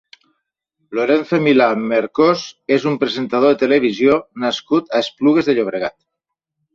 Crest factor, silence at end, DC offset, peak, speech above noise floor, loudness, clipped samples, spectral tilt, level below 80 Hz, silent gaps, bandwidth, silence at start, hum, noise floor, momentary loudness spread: 16 dB; 0.85 s; under 0.1%; -2 dBFS; 64 dB; -16 LUFS; under 0.1%; -6 dB/octave; -60 dBFS; none; 7.6 kHz; 0.9 s; none; -80 dBFS; 8 LU